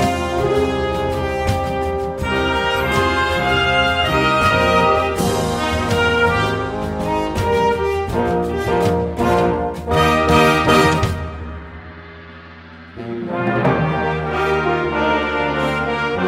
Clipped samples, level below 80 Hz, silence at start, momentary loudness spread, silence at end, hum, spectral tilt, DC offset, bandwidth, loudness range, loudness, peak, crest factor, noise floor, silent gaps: under 0.1%; -32 dBFS; 0 s; 13 LU; 0 s; none; -5.5 dB/octave; under 0.1%; 16 kHz; 5 LU; -17 LUFS; 0 dBFS; 18 dB; -38 dBFS; none